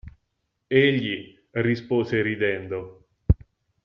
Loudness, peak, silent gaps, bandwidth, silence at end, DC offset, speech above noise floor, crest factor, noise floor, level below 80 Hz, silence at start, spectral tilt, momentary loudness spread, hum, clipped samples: -24 LUFS; -4 dBFS; none; 6.4 kHz; 0.5 s; under 0.1%; 53 dB; 20 dB; -76 dBFS; -38 dBFS; 0.05 s; -5.5 dB/octave; 14 LU; none; under 0.1%